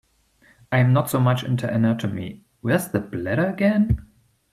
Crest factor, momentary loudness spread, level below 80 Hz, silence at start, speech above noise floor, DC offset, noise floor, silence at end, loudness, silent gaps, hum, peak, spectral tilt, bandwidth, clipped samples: 16 dB; 9 LU; -42 dBFS; 0.7 s; 38 dB; under 0.1%; -58 dBFS; 0.5 s; -22 LUFS; none; none; -6 dBFS; -7 dB/octave; 14.5 kHz; under 0.1%